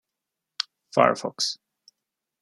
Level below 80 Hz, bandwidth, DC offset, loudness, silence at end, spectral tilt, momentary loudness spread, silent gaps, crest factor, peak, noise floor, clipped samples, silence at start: -76 dBFS; 13 kHz; under 0.1%; -25 LUFS; 0.85 s; -3 dB/octave; 16 LU; none; 26 dB; -2 dBFS; -85 dBFS; under 0.1%; 0.6 s